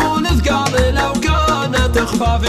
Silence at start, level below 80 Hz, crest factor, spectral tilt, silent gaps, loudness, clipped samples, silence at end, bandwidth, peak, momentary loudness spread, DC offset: 0 s; -22 dBFS; 12 dB; -5 dB/octave; none; -15 LUFS; under 0.1%; 0 s; 14.5 kHz; -2 dBFS; 1 LU; under 0.1%